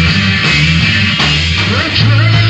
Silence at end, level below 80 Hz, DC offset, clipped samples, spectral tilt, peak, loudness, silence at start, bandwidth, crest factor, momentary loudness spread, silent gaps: 0 s; -26 dBFS; under 0.1%; under 0.1%; -4.5 dB/octave; 0 dBFS; -9 LUFS; 0 s; 8.6 kHz; 10 dB; 2 LU; none